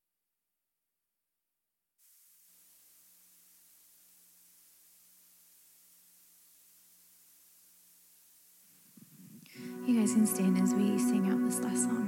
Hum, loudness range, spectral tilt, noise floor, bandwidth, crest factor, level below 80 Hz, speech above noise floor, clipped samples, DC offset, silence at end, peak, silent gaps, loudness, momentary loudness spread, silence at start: none; 28 LU; -5.5 dB/octave; -87 dBFS; 17 kHz; 20 dB; -86 dBFS; 59 dB; under 0.1%; under 0.1%; 0 s; -16 dBFS; none; -30 LUFS; 25 LU; 9.2 s